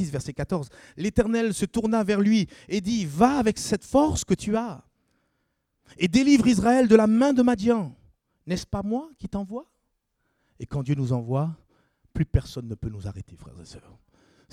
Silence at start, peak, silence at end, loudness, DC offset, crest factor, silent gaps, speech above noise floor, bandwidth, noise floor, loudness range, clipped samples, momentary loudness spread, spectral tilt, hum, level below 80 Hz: 0 s; -2 dBFS; 0.75 s; -24 LUFS; under 0.1%; 22 dB; none; 52 dB; 14.5 kHz; -75 dBFS; 10 LU; under 0.1%; 18 LU; -6 dB/octave; none; -46 dBFS